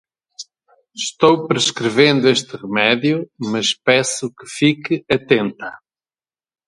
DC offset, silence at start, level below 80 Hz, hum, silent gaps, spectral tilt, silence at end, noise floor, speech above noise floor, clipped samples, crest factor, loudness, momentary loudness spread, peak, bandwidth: under 0.1%; 0.4 s; -58 dBFS; none; none; -4 dB/octave; 0.9 s; under -90 dBFS; over 73 dB; under 0.1%; 18 dB; -17 LUFS; 18 LU; 0 dBFS; 11.5 kHz